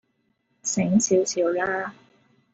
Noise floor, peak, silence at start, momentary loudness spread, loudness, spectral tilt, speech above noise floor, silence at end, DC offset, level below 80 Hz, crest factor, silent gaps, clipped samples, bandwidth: -71 dBFS; -8 dBFS; 0.65 s; 11 LU; -23 LUFS; -4.5 dB/octave; 48 dB; 0.6 s; under 0.1%; -64 dBFS; 18 dB; none; under 0.1%; 8.2 kHz